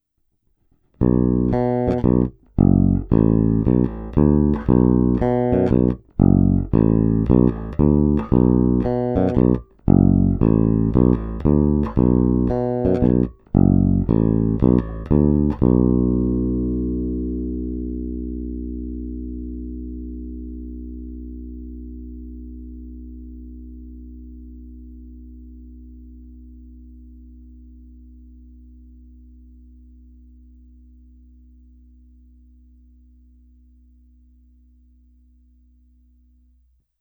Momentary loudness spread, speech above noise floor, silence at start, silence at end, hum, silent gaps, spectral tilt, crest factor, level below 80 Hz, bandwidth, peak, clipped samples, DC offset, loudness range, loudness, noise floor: 21 LU; 51 dB; 1 s; 9.5 s; none; none; -12.5 dB/octave; 20 dB; -30 dBFS; 3.7 kHz; 0 dBFS; under 0.1%; under 0.1%; 20 LU; -19 LUFS; -68 dBFS